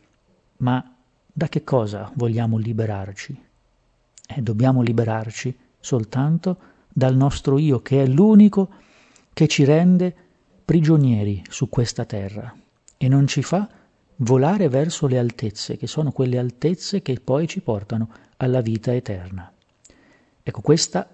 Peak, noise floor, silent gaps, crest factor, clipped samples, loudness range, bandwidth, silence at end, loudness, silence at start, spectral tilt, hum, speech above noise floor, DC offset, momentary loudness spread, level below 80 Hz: -2 dBFS; -63 dBFS; none; 18 dB; under 0.1%; 7 LU; 8.6 kHz; 0.1 s; -20 LUFS; 0.6 s; -7 dB/octave; none; 44 dB; under 0.1%; 16 LU; -50 dBFS